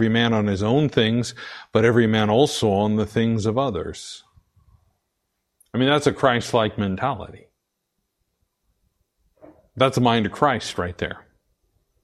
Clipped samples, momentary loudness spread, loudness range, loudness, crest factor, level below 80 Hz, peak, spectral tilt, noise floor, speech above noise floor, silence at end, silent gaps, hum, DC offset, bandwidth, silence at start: under 0.1%; 13 LU; 6 LU; -21 LUFS; 20 dB; -52 dBFS; -2 dBFS; -5.5 dB/octave; -77 dBFS; 56 dB; 0.85 s; none; none; under 0.1%; 12.5 kHz; 0 s